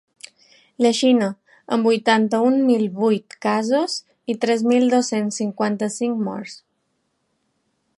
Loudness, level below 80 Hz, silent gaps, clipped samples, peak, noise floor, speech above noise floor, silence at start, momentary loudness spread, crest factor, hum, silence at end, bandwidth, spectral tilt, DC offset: -20 LUFS; -74 dBFS; none; under 0.1%; -4 dBFS; -71 dBFS; 52 dB; 0.8 s; 10 LU; 18 dB; none; 1.45 s; 11.5 kHz; -4.5 dB/octave; under 0.1%